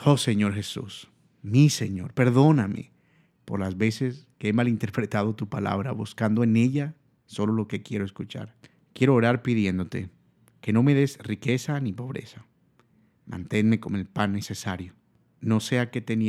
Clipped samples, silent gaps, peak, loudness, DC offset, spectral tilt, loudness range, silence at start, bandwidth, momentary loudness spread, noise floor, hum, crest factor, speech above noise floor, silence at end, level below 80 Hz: under 0.1%; none; -4 dBFS; -25 LUFS; under 0.1%; -6.5 dB/octave; 5 LU; 0 s; 14 kHz; 16 LU; -63 dBFS; none; 20 dB; 39 dB; 0 s; -64 dBFS